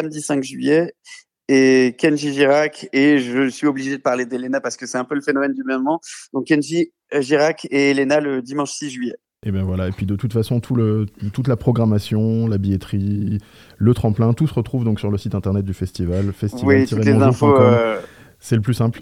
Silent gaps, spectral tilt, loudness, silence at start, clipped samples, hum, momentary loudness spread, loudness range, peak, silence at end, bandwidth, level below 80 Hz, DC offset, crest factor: none; -6.5 dB/octave; -19 LUFS; 0 s; under 0.1%; none; 10 LU; 4 LU; 0 dBFS; 0 s; 14 kHz; -50 dBFS; under 0.1%; 18 dB